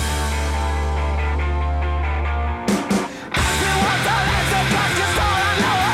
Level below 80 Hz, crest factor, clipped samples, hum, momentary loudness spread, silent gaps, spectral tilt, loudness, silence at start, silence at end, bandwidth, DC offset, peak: -24 dBFS; 12 dB; under 0.1%; none; 5 LU; none; -4 dB/octave; -20 LUFS; 0 s; 0 s; 15.5 kHz; under 0.1%; -8 dBFS